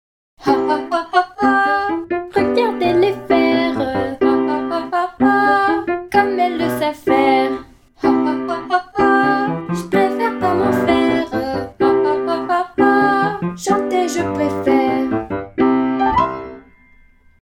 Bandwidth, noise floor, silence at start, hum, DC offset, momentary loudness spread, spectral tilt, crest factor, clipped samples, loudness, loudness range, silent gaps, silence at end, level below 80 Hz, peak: 16 kHz; -49 dBFS; 0.4 s; none; under 0.1%; 7 LU; -5.5 dB/octave; 16 dB; under 0.1%; -17 LUFS; 1 LU; none; 0.85 s; -46 dBFS; -2 dBFS